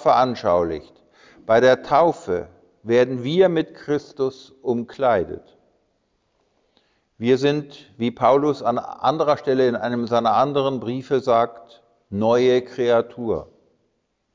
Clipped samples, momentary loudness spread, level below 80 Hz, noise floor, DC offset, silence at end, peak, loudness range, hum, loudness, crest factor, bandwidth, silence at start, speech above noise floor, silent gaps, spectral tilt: under 0.1%; 10 LU; -54 dBFS; -70 dBFS; under 0.1%; 0.9 s; -4 dBFS; 6 LU; none; -20 LUFS; 16 dB; 7.6 kHz; 0 s; 51 dB; none; -6.5 dB/octave